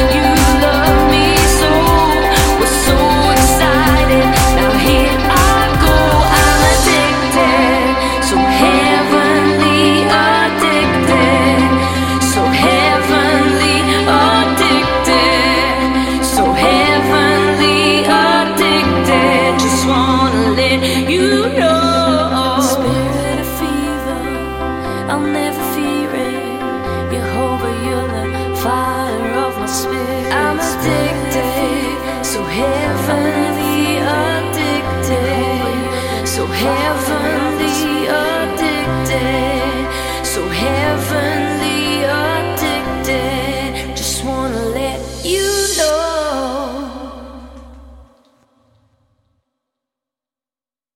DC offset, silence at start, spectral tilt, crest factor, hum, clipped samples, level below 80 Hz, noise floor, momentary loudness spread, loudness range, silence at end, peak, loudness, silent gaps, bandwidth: under 0.1%; 0 s; -4 dB/octave; 14 dB; none; under 0.1%; -26 dBFS; under -90 dBFS; 9 LU; 8 LU; 2.95 s; 0 dBFS; -13 LUFS; none; 17 kHz